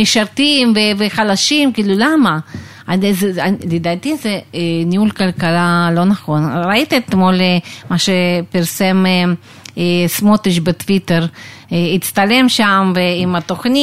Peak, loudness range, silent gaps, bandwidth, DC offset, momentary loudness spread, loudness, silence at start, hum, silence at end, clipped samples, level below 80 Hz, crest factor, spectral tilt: 0 dBFS; 2 LU; none; 16 kHz; 0.5%; 8 LU; -14 LUFS; 0 s; none; 0 s; under 0.1%; -50 dBFS; 14 dB; -5 dB/octave